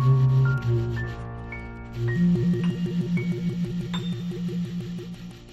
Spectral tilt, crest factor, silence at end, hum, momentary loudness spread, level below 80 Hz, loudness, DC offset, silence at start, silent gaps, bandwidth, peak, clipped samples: -8.5 dB/octave; 14 dB; 0 s; none; 15 LU; -44 dBFS; -26 LUFS; under 0.1%; 0 s; none; 7.8 kHz; -10 dBFS; under 0.1%